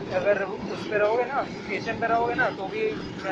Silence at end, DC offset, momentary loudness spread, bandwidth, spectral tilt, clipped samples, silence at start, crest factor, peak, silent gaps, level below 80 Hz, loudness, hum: 0 s; under 0.1%; 7 LU; 8.2 kHz; -6 dB/octave; under 0.1%; 0 s; 16 dB; -10 dBFS; none; -56 dBFS; -26 LUFS; none